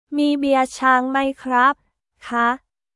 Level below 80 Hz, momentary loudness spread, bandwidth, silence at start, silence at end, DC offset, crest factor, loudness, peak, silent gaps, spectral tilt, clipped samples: -60 dBFS; 8 LU; 12 kHz; 0.1 s; 0.4 s; under 0.1%; 16 dB; -19 LUFS; -2 dBFS; none; -3 dB/octave; under 0.1%